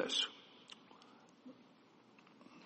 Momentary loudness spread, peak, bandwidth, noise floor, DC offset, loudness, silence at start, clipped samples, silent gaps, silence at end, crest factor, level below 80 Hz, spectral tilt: 27 LU; -24 dBFS; 8.4 kHz; -66 dBFS; under 0.1%; -38 LUFS; 0 s; under 0.1%; none; 0 s; 24 dB; under -90 dBFS; -1 dB/octave